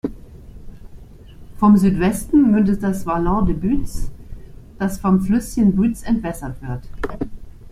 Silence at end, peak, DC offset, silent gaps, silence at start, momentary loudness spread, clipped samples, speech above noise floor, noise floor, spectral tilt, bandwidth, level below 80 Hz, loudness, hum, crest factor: 0 s; -4 dBFS; under 0.1%; none; 0.05 s; 16 LU; under 0.1%; 22 dB; -39 dBFS; -7.5 dB/octave; 15 kHz; -32 dBFS; -18 LUFS; none; 16 dB